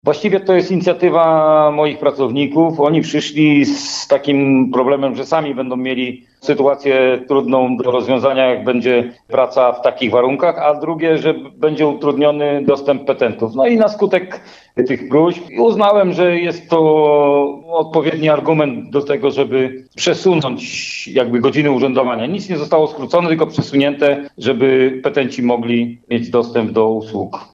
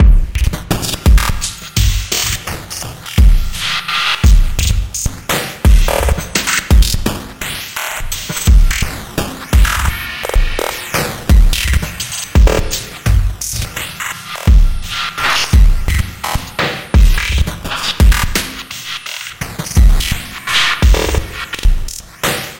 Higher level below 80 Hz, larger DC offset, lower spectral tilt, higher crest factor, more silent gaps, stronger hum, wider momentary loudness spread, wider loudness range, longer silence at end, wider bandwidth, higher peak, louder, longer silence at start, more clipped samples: second, -62 dBFS vs -14 dBFS; neither; first, -6 dB/octave vs -3.5 dB/octave; about the same, 12 dB vs 12 dB; neither; neither; second, 7 LU vs 10 LU; about the same, 3 LU vs 2 LU; about the same, 0.1 s vs 0 s; second, 8 kHz vs 17.5 kHz; about the same, -2 dBFS vs 0 dBFS; about the same, -15 LUFS vs -15 LUFS; about the same, 0.05 s vs 0 s; neither